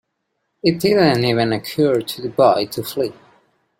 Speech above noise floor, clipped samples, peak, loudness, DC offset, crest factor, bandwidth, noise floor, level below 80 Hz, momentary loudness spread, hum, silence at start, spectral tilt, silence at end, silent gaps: 56 dB; under 0.1%; -2 dBFS; -18 LUFS; under 0.1%; 18 dB; 16.5 kHz; -73 dBFS; -56 dBFS; 9 LU; none; 0.65 s; -6 dB/octave; 0.65 s; none